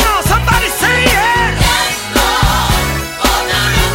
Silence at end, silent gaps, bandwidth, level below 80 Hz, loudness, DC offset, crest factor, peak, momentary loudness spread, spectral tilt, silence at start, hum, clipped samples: 0 s; none; 16.5 kHz; -20 dBFS; -12 LUFS; under 0.1%; 12 dB; 0 dBFS; 4 LU; -3 dB/octave; 0 s; none; under 0.1%